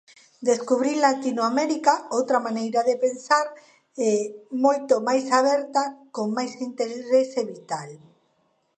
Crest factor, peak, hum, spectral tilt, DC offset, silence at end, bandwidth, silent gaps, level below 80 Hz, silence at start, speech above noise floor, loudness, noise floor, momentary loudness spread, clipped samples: 18 dB; -4 dBFS; none; -3.5 dB/octave; under 0.1%; 0.8 s; 9.2 kHz; none; -80 dBFS; 0.4 s; 45 dB; -23 LUFS; -68 dBFS; 11 LU; under 0.1%